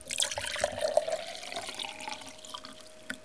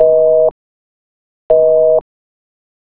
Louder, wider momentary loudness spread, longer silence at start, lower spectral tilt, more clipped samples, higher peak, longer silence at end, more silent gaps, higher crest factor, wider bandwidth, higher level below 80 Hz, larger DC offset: second, -34 LUFS vs -11 LUFS; first, 13 LU vs 7 LU; about the same, 0 s vs 0 s; second, -0.5 dB/octave vs -10.5 dB/octave; neither; second, -8 dBFS vs 0 dBFS; second, 0 s vs 1 s; second, none vs 0.51-1.50 s; first, 26 dB vs 14 dB; first, 11 kHz vs 2 kHz; second, -64 dBFS vs -50 dBFS; second, 0.2% vs 1%